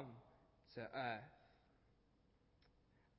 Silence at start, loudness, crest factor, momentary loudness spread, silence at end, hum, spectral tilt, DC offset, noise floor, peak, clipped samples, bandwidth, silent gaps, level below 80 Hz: 0 s; -50 LUFS; 22 dB; 19 LU; 0.5 s; none; -3.5 dB/octave; under 0.1%; -77 dBFS; -34 dBFS; under 0.1%; 5.6 kHz; none; -80 dBFS